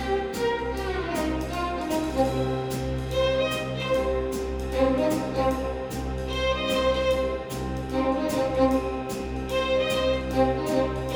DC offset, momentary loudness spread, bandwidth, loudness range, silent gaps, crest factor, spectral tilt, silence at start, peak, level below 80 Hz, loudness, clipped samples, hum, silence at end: under 0.1%; 7 LU; over 20 kHz; 1 LU; none; 16 dB; -5.5 dB/octave; 0 s; -10 dBFS; -36 dBFS; -26 LUFS; under 0.1%; none; 0 s